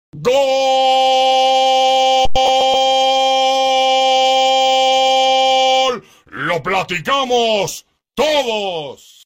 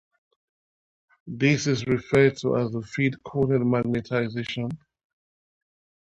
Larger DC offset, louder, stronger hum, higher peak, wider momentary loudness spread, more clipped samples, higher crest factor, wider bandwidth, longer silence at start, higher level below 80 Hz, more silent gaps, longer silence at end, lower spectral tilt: neither; first, -14 LUFS vs -24 LUFS; neither; first, -2 dBFS vs -6 dBFS; about the same, 9 LU vs 10 LU; neither; second, 12 dB vs 20 dB; first, 16.5 kHz vs 10.5 kHz; second, 0.15 s vs 1.25 s; first, -42 dBFS vs -56 dBFS; neither; second, 0.3 s vs 1.35 s; second, -2 dB/octave vs -6.5 dB/octave